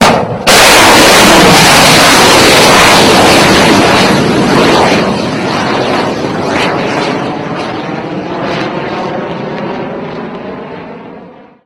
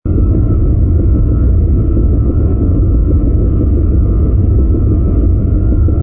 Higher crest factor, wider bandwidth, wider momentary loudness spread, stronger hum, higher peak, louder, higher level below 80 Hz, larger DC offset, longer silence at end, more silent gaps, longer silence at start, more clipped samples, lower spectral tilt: about the same, 8 dB vs 6 dB; first, over 20 kHz vs 1.5 kHz; first, 17 LU vs 1 LU; neither; about the same, 0 dBFS vs -2 dBFS; first, -6 LUFS vs -12 LUFS; second, -32 dBFS vs -12 dBFS; neither; first, 0.35 s vs 0 s; neither; about the same, 0 s vs 0.05 s; first, 3% vs under 0.1%; second, -3 dB/octave vs -16 dB/octave